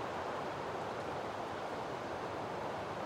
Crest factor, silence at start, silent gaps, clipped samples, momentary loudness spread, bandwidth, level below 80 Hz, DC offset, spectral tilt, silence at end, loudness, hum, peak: 12 dB; 0 s; none; under 0.1%; 1 LU; 16 kHz; -68 dBFS; under 0.1%; -5 dB/octave; 0 s; -41 LUFS; none; -28 dBFS